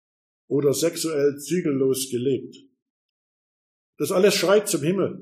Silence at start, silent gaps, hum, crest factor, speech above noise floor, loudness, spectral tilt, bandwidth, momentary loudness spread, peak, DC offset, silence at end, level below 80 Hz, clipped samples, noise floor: 0.5 s; 2.82-3.93 s; none; 16 dB; over 68 dB; -22 LUFS; -4.5 dB/octave; 15.5 kHz; 7 LU; -8 dBFS; under 0.1%; 0 s; -72 dBFS; under 0.1%; under -90 dBFS